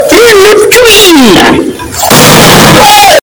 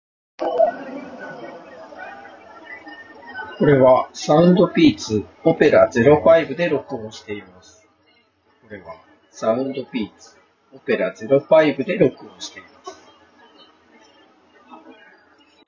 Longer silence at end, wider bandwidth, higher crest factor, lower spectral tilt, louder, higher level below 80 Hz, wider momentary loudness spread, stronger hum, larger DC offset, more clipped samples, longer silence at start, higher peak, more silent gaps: second, 0.05 s vs 2.75 s; first, over 20 kHz vs 7.4 kHz; second, 2 dB vs 20 dB; second, -3 dB/octave vs -6.5 dB/octave; first, -1 LUFS vs -17 LUFS; first, -26 dBFS vs -54 dBFS; second, 6 LU vs 24 LU; neither; neither; first, 60% vs under 0.1%; second, 0 s vs 0.4 s; about the same, 0 dBFS vs 0 dBFS; neither